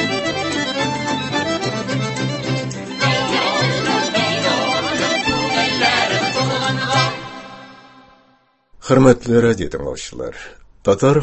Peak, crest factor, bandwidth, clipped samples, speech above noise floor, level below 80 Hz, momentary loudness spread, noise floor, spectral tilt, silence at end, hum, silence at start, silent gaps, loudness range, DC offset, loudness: 0 dBFS; 18 dB; 8.6 kHz; under 0.1%; 42 dB; -46 dBFS; 14 LU; -57 dBFS; -4.5 dB/octave; 0 s; none; 0 s; none; 3 LU; under 0.1%; -18 LUFS